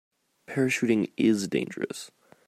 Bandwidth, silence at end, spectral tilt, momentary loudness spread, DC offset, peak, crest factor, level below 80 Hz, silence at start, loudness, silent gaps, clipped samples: 15 kHz; 0.4 s; -5 dB/octave; 12 LU; under 0.1%; -12 dBFS; 16 dB; -72 dBFS; 0.5 s; -27 LUFS; none; under 0.1%